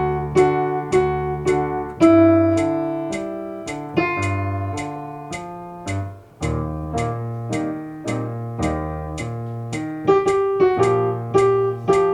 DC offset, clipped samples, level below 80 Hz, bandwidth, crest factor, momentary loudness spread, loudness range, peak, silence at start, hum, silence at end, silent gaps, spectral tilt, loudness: under 0.1%; under 0.1%; -40 dBFS; 10.5 kHz; 18 dB; 13 LU; 8 LU; -2 dBFS; 0 s; none; 0 s; none; -7 dB/octave; -21 LUFS